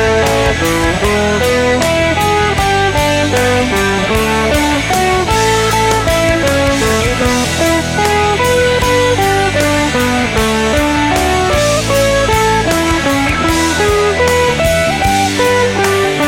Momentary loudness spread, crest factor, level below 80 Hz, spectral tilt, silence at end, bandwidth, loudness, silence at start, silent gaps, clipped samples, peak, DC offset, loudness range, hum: 2 LU; 12 dB; -26 dBFS; -4 dB/octave; 0 s; 16.5 kHz; -12 LUFS; 0 s; none; under 0.1%; 0 dBFS; under 0.1%; 0 LU; none